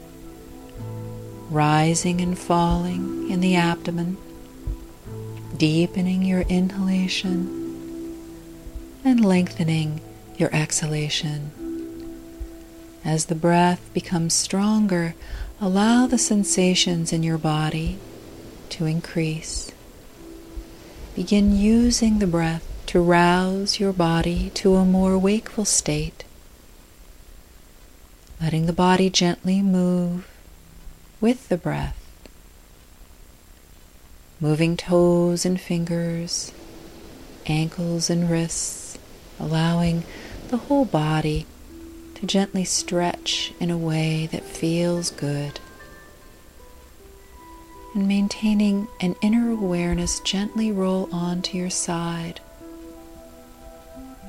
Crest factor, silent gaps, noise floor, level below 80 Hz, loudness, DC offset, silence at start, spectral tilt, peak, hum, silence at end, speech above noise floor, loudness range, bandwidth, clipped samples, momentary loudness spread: 18 dB; none; -48 dBFS; -40 dBFS; -22 LUFS; under 0.1%; 0 s; -5 dB/octave; -4 dBFS; none; 0 s; 27 dB; 8 LU; 16 kHz; under 0.1%; 22 LU